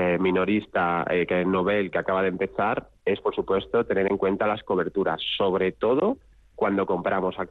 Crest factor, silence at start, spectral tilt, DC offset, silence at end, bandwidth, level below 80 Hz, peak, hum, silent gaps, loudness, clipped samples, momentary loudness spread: 12 dB; 0 s; -8 dB/octave; under 0.1%; 0.05 s; 4.6 kHz; -56 dBFS; -12 dBFS; none; none; -25 LUFS; under 0.1%; 4 LU